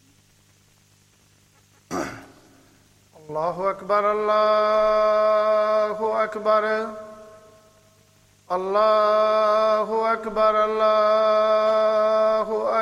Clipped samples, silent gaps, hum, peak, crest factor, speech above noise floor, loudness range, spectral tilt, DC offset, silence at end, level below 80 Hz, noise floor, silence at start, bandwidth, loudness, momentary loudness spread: under 0.1%; none; 50 Hz at -60 dBFS; -8 dBFS; 14 dB; 38 dB; 10 LU; -4.5 dB/octave; under 0.1%; 0 s; -58 dBFS; -58 dBFS; 1.9 s; 10.5 kHz; -20 LUFS; 11 LU